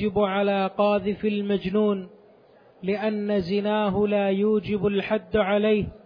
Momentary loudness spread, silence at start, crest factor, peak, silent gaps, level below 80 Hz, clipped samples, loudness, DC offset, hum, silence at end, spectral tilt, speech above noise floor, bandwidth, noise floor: 4 LU; 0 s; 14 dB; -10 dBFS; none; -52 dBFS; under 0.1%; -24 LUFS; under 0.1%; none; 0.1 s; -9 dB/octave; 31 dB; 5.2 kHz; -54 dBFS